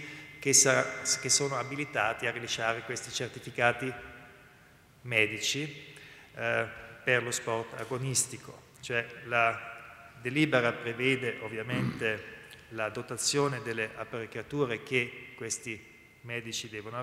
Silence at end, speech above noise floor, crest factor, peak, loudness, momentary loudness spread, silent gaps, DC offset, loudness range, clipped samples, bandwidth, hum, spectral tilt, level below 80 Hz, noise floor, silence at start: 0 s; 27 dB; 24 dB; -8 dBFS; -30 LUFS; 18 LU; none; under 0.1%; 4 LU; under 0.1%; 16 kHz; none; -2.5 dB/octave; -66 dBFS; -58 dBFS; 0 s